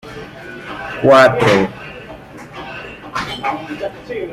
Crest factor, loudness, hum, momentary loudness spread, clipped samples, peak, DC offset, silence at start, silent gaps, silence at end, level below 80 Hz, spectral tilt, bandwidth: 18 dB; -15 LUFS; none; 23 LU; under 0.1%; 0 dBFS; under 0.1%; 0.05 s; none; 0 s; -46 dBFS; -5.5 dB/octave; 15.5 kHz